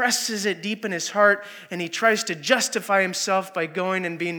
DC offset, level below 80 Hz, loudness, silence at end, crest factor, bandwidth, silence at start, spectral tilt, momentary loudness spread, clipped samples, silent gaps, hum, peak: under 0.1%; -90 dBFS; -22 LUFS; 0 s; 22 dB; over 20 kHz; 0 s; -2.5 dB/octave; 8 LU; under 0.1%; none; none; -2 dBFS